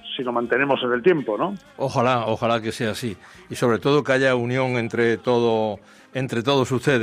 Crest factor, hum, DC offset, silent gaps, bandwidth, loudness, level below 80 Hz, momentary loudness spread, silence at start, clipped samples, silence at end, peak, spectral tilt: 16 dB; none; under 0.1%; none; 15.5 kHz; -22 LUFS; -62 dBFS; 10 LU; 0.05 s; under 0.1%; 0 s; -6 dBFS; -6 dB/octave